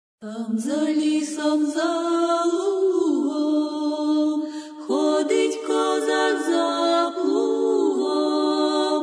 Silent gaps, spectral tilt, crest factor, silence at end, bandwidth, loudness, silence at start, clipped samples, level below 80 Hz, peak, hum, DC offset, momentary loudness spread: none; -3.5 dB/octave; 12 dB; 0 s; 11 kHz; -22 LUFS; 0.2 s; under 0.1%; -82 dBFS; -10 dBFS; none; under 0.1%; 4 LU